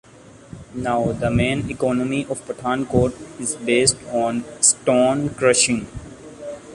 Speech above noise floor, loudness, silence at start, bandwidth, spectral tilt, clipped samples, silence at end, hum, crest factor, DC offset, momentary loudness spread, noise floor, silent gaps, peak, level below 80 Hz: 22 dB; -20 LUFS; 0.5 s; 11.5 kHz; -3.5 dB/octave; under 0.1%; 0 s; none; 20 dB; under 0.1%; 19 LU; -42 dBFS; none; 0 dBFS; -44 dBFS